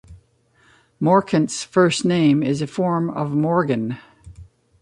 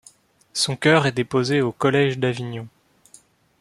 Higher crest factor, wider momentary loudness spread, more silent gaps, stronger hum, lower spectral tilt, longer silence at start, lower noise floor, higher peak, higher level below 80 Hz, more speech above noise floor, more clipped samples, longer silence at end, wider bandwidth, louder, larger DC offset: about the same, 18 dB vs 20 dB; second, 7 LU vs 14 LU; neither; neither; about the same, -6 dB/octave vs -5 dB/octave; second, 0.1 s vs 0.55 s; first, -58 dBFS vs -54 dBFS; about the same, -2 dBFS vs -2 dBFS; first, -54 dBFS vs -62 dBFS; first, 40 dB vs 33 dB; neither; second, 0.4 s vs 0.9 s; second, 11.5 kHz vs 13 kHz; about the same, -19 LUFS vs -20 LUFS; neither